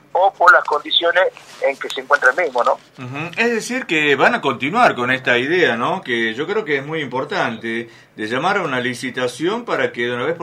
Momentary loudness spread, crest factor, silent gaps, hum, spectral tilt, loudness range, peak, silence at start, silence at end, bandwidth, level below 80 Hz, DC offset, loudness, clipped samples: 10 LU; 18 dB; none; none; -4 dB/octave; 5 LU; 0 dBFS; 0.15 s; 0 s; 15.5 kHz; -66 dBFS; under 0.1%; -17 LUFS; under 0.1%